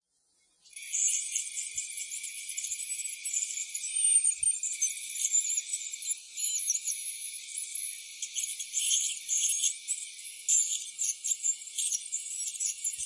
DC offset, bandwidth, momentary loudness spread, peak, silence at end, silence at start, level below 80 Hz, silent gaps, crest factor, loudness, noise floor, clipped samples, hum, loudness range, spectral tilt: under 0.1%; 12 kHz; 10 LU; -14 dBFS; 0 s; 0.65 s; -80 dBFS; none; 18 dB; -29 LUFS; -72 dBFS; under 0.1%; none; 4 LU; 6.5 dB/octave